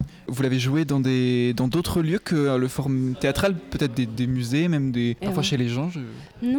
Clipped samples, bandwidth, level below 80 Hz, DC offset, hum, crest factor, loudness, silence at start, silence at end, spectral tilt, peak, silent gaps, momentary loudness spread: under 0.1%; 19 kHz; -46 dBFS; under 0.1%; none; 14 dB; -24 LUFS; 0 s; 0 s; -6.5 dB/octave; -8 dBFS; none; 5 LU